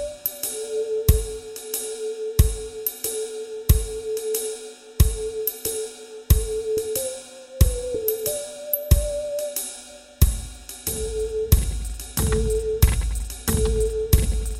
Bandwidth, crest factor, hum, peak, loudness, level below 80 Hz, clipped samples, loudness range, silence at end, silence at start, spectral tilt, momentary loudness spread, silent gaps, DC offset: 16.5 kHz; 22 dB; none; -2 dBFS; -24 LUFS; -26 dBFS; under 0.1%; 2 LU; 0 s; 0 s; -5 dB/octave; 10 LU; none; under 0.1%